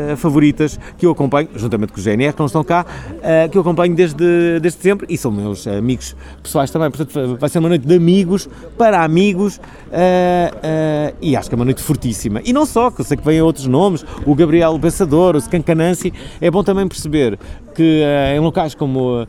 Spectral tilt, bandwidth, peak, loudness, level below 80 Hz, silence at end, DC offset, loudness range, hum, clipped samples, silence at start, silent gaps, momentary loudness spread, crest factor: -6.5 dB/octave; 15.5 kHz; 0 dBFS; -15 LUFS; -36 dBFS; 0 s; under 0.1%; 3 LU; none; under 0.1%; 0 s; none; 8 LU; 14 dB